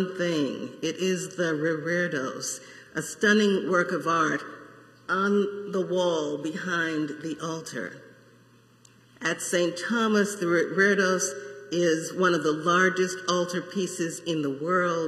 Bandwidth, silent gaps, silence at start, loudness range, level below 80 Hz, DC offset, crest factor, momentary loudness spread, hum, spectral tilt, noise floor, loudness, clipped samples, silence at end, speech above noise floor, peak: 14 kHz; none; 0 s; 6 LU; -76 dBFS; under 0.1%; 18 dB; 11 LU; none; -4 dB/octave; -57 dBFS; -26 LUFS; under 0.1%; 0 s; 31 dB; -8 dBFS